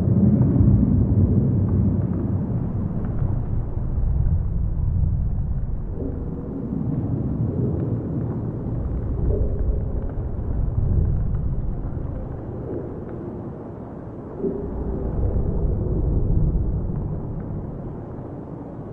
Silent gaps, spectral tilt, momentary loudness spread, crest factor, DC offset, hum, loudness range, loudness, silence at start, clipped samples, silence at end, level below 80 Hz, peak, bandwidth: none; -13.5 dB/octave; 14 LU; 16 dB; under 0.1%; none; 7 LU; -24 LUFS; 0 s; under 0.1%; 0 s; -26 dBFS; -6 dBFS; 2.3 kHz